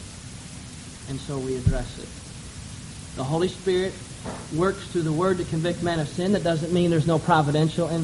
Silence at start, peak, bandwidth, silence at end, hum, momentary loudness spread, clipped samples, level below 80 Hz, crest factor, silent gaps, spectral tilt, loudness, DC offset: 0 s; -6 dBFS; 11.5 kHz; 0 s; none; 18 LU; under 0.1%; -42 dBFS; 20 dB; none; -6 dB/octave; -25 LUFS; under 0.1%